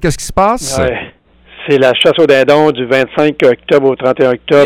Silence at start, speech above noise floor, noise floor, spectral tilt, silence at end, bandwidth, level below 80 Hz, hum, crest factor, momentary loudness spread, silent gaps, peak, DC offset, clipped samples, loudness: 0 s; 31 dB; -41 dBFS; -4.5 dB/octave; 0 s; 15.5 kHz; -34 dBFS; none; 10 dB; 7 LU; none; 0 dBFS; under 0.1%; under 0.1%; -10 LUFS